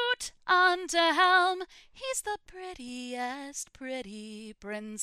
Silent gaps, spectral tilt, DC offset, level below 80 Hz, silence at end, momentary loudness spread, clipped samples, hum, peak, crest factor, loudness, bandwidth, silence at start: none; -1 dB/octave; under 0.1%; -64 dBFS; 0 s; 20 LU; under 0.1%; none; -12 dBFS; 18 dB; -28 LUFS; 15.5 kHz; 0 s